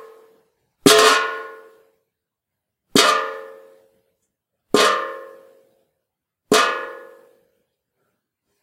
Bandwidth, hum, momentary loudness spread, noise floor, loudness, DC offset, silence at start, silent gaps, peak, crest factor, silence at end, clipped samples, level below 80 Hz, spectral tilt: 16 kHz; none; 22 LU; -82 dBFS; -16 LUFS; under 0.1%; 0.85 s; none; 0 dBFS; 22 dB; 1.6 s; under 0.1%; -64 dBFS; -2 dB/octave